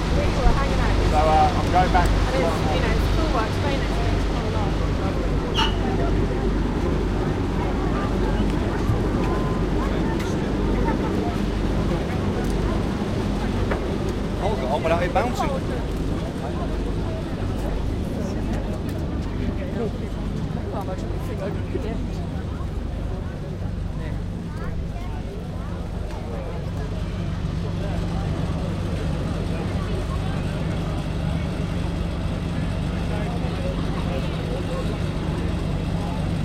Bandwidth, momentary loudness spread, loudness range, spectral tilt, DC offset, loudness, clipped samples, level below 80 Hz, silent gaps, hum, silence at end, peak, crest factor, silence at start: 13.5 kHz; 8 LU; 7 LU; -7 dB/octave; under 0.1%; -25 LUFS; under 0.1%; -28 dBFS; none; none; 0 s; -6 dBFS; 18 dB; 0 s